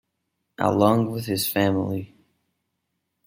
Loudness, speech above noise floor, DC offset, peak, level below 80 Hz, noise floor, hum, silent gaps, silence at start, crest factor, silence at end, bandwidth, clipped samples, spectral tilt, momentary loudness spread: -23 LUFS; 56 dB; under 0.1%; -4 dBFS; -62 dBFS; -78 dBFS; none; none; 0.6 s; 20 dB; 1.2 s; 16.5 kHz; under 0.1%; -5.5 dB/octave; 8 LU